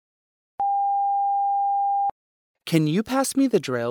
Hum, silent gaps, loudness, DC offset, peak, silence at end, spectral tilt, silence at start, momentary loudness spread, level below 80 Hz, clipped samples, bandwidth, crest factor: none; 2.11-2.55 s; -23 LUFS; under 0.1%; -6 dBFS; 0 s; -5.5 dB/octave; 0.6 s; 4 LU; -66 dBFS; under 0.1%; 19 kHz; 16 dB